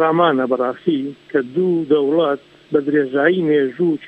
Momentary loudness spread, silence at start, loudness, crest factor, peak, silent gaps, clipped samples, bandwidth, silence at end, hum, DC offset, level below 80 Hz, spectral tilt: 6 LU; 0 s; -18 LUFS; 16 dB; -2 dBFS; none; under 0.1%; 5 kHz; 0 s; none; under 0.1%; -66 dBFS; -8.5 dB/octave